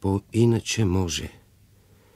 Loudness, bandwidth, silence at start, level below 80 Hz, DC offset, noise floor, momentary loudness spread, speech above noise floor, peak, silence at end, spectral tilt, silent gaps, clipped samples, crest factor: -24 LUFS; 14.5 kHz; 0 s; -48 dBFS; under 0.1%; -56 dBFS; 9 LU; 33 dB; -8 dBFS; 0.9 s; -5.5 dB/octave; none; under 0.1%; 16 dB